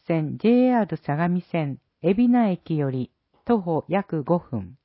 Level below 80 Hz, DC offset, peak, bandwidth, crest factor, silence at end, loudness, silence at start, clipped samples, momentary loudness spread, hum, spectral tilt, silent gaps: -58 dBFS; under 0.1%; -8 dBFS; 4.8 kHz; 16 dB; 0.1 s; -23 LUFS; 0.1 s; under 0.1%; 11 LU; none; -12.5 dB/octave; none